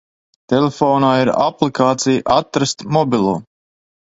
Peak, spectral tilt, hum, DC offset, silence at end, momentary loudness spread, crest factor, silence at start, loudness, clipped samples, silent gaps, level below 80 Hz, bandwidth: 0 dBFS; -5.5 dB/octave; none; under 0.1%; 0.65 s; 5 LU; 16 dB; 0.5 s; -16 LUFS; under 0.1%; none; -52 dBFS; 8 kHz